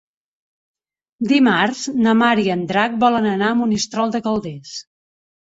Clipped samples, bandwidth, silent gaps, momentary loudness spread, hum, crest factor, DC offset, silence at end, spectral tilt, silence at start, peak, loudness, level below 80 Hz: under 0.1%; 8 kHz; none; 13 LU; none; 16 dB; under 0.1%; 0.7 s; -4.5 dB/octave; 1.2 s; -4 dBFS; -17 LUFS; -58 dBFS